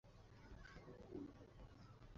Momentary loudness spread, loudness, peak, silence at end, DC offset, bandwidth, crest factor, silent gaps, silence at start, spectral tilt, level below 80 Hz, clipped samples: 9 LU; -60 LUFS; -42 dBFS; 0 s; under 0.1%; 7.2 kHz; 18 dB; none; 0.05 s; -6 dB/octave; -66 dBFS; under 0.1%